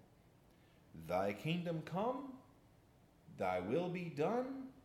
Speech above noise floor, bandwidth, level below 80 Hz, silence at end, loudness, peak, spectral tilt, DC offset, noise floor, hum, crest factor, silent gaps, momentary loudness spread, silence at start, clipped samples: 28 dB; 16 kHz; -76 dBFS; 0.05 s; -40 LUFS; -24 dBFS; -7 dB/octave; under 0.1%; -67 dBFS; none; 18 dB; none; 17 LU; 0.95 s; under 0.1%